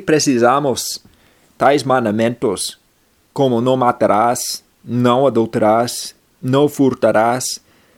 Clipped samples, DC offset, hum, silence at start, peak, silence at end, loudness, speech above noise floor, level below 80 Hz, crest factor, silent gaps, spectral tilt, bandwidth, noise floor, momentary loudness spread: under 0.1%; under 0.1%; none; 0 s; 0 dBFS; 0.4 s; -16 LUFS; 42 dB; -58 dBFS; 16 dB; none; -4.5 dB/octave; 17 kHz; -57 dBFS; 11 LU